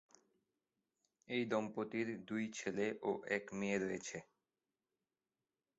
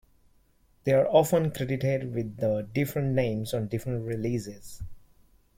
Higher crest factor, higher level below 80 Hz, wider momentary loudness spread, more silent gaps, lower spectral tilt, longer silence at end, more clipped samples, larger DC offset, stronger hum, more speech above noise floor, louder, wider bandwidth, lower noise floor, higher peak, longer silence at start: about the same, 20 dB vs 20 dB; second, -80 dBFS vs -52 dBFS; second, 4 LU vs 18 LU; neither; second, -4.5 dB/octave vs -7 dB/octave; first, 1.55 s vs 0.6 s; neither; neither; neither; first, over 49 dB vs 37 dB; second, -41 LUFS vs -28 LUFS; second, 8 kHz vs 16.5 kHz; first, under -90 dBFS vs -64 dBFS; second, -24 dBFS vs -8 dBFS; first, 1.3 s vs 0.85 s